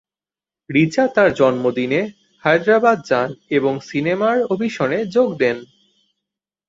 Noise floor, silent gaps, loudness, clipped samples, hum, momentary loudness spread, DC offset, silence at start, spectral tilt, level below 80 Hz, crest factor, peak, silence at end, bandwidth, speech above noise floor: under -90 dBFS; none; -18 LUFS; under 0.1%; none; 6 LU; under 0.1%; 0.7 s; -6.5 dB/octave; -60 dBFS; 16 dB; -2 dBFS; 1.05 s; 7.8 kHz; over 73 dB